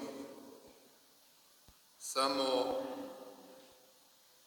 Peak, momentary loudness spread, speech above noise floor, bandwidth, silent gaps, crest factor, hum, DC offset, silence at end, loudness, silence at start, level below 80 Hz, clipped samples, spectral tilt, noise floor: -18 dBFS; 25 LU; 30 dB; over 20 kHz; none; 22 dB; none; under 0.1%; 0.7 s; -37 LUFS; 0 s; -80 dBFS; under 0.1%; -2 dB/octave; -65 dBFS